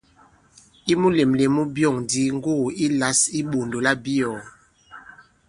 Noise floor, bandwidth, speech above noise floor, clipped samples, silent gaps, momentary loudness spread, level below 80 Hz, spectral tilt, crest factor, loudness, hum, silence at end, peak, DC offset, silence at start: -55 dBFS; 11.5 kHz; 34 dB; under 0.1%; none; 7 LU; -56 dBFS; -4 dB/octave; 20 dB; -21 LUFS; none; 0.5 s; -4 dBFS; under 0.1%; 0.85 s